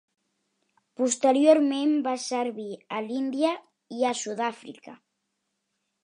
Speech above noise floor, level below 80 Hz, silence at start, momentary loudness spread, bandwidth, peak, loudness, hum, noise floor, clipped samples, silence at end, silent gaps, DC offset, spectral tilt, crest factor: 54 dB; -84 dBFS; 1 s; 18 LU; 11 kHz; -6 dBFS; -25 LUFS; none; -79 dBFS; under 0.1%; 1.1 s; none; under 0.1%; -3 dB/octave; 20 dB